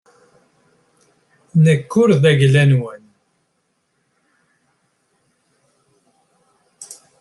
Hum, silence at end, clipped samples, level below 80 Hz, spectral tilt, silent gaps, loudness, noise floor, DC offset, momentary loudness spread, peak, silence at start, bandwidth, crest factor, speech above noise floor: none; 0.3 s; under 0.1%; -60 dBFS; -7 dB/octave; none; -14 LUFS; -68 dBFS; under 0.1%; 24 LU; -2 dBFS; 1.55 s; 12 kHz; 18 dB; 55 dB